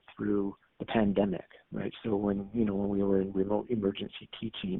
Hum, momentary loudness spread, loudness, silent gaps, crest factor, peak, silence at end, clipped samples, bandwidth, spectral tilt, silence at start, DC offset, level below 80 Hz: none; 12 LU; -32 LUFS; none; 18 dB; -12 dBFS; 0 s; under 0.1%; 4 kHz; -6.5 dB/octave; 0.1 s; under 0.1%; -56 dBFS